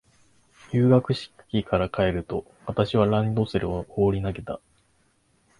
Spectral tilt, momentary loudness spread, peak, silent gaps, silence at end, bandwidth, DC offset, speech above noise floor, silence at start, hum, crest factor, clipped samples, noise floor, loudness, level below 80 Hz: -8.5 dB/octave; 12 LU; -6 dBFS; none; 1.05 s; 11 kHz; under 0.1%; 41 dB; 0.7 s; none; 20 dB; under 0.1%; -65 dBFS; -25 LUFS; -46 dBFS